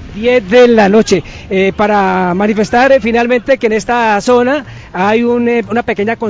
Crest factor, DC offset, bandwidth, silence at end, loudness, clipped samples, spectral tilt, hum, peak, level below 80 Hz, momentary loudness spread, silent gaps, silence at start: 10 dB; under 0.1%; 7.8 kHz; 0 s; -11 LUFS; under 0.1%; -5.5 dB/octave; none; 0 dBFS; -38 dBFS; 8 LU; none; 0 s